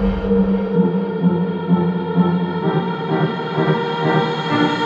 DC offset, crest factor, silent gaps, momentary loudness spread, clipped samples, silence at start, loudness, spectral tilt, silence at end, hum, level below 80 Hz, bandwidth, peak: under 0.1%; 14 dB; none; 3 LU; under 0.1%; 0 s; -18 LUFS; -8.5 dB/octave; 0 s; none; -36 dBFS; 7.2 kHz; -4 dBFS